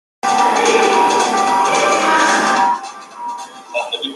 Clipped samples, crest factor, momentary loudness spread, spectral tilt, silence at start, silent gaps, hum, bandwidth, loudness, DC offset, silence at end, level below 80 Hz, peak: under 0.1%; 14 dB; 15 LU; -1.5 dB/octave; 0.25 s; none; none; 12.5 kHz; -14 LUFS; under 0.1%; 0 s; -62 dBFS; -2 dBFS